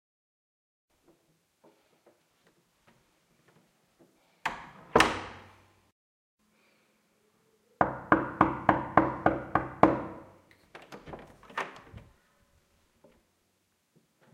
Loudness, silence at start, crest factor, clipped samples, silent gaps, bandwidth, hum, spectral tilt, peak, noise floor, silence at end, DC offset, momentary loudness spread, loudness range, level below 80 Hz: -28 LUFS; 4.45 s; 32 dB; under 0.1%; 5.92-6.38 s; 16 kHz; none; -5.5 dB/octave; -2 dBFS; -74 dBFS; 2.35 s; under 0.1%; 24 LU; 18 LU; -56 dBFS